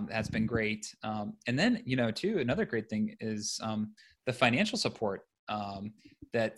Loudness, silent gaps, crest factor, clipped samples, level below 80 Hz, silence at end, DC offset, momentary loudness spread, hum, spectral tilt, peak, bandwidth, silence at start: -32 LUFS; 5.39-5.47 s; 24 dB; under 0.1%; -60 dBFS; 0.05 s; under 0.1%; 10 LU; none; -5 dB/octave; -8 dBFS; 12.5 kHz; 0 s